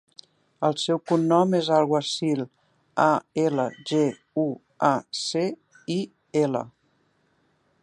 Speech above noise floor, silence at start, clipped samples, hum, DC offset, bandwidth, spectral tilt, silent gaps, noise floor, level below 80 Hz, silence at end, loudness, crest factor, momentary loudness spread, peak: 44 dB; 0.6 s; under 0.1%; none; under 0.1%; 11.5 kHz; -5.5 dB/octave; none; -67 dBFS; -74 dBFS; 1.15 s; -25 LUFS; 20 dB; 9 LU; -4 dBFS